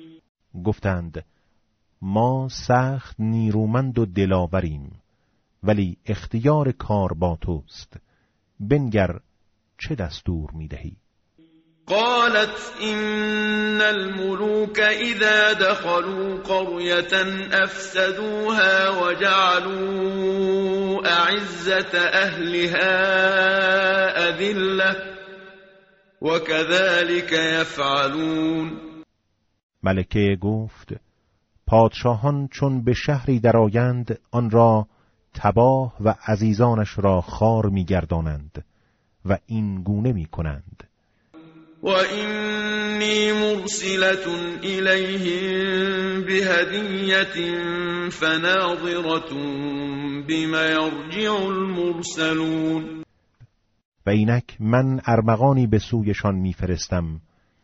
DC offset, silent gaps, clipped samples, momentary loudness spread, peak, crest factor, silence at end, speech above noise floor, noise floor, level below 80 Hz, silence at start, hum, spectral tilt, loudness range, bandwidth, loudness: under 0.1%; 0.29-0.35 s, 29.63-29.69 s, 53.85-53.92 s; under 0.1%; 11 LU; -4 dBFS; 18 dB; 0.45 s; 49 dB; -70 dBFS; -44 dBFS; 0 s; none; -4 dB/octave; 6 LU; 8 kHz; -21 LUFS